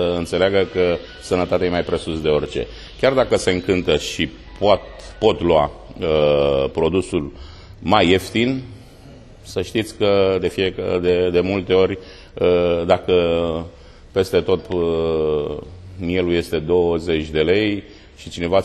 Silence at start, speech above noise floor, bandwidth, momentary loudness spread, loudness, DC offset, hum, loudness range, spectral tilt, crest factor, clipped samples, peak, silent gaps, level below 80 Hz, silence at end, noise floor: 0 s; 23 dB; 13 kHz; 12 LU; -19 LUFS; under 0.1%; none; 2 LU; -5.5 dB/octave; 18 dB; under 0.1%; 0 dBFS; none; -40 dBFS; 0 s; -42 dBFS